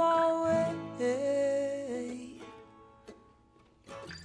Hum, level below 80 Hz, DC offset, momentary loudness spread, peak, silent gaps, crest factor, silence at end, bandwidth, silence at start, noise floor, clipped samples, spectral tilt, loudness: none; -68 dBFS; under 0.1%; 22 LU; -16 dBFS; none; 16 dB; 0 s; 10.5 kHz; 0 s; -63 dBFS; under 0.1%; -5.5 dB/octave; -31 LUFS